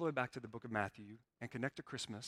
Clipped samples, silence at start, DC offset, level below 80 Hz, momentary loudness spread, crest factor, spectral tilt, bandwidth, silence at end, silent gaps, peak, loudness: under 0.1%; 0 s; under 0.1%; -76 dBFS; 12 LU; 22 dB; -5 dB/octave; 15 kHz; 0 s; none; -20 dBFS; -44 LUFS